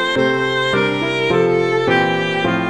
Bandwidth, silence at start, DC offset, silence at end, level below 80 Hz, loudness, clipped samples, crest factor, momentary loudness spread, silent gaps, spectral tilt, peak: 11 kHz; 0 s; 0.4%; 0 s; -50 dBFS; -16 LUFS; under 0.1%; 14 dB; 2 LU; none; -5.5 dB/octave; -2 dBFS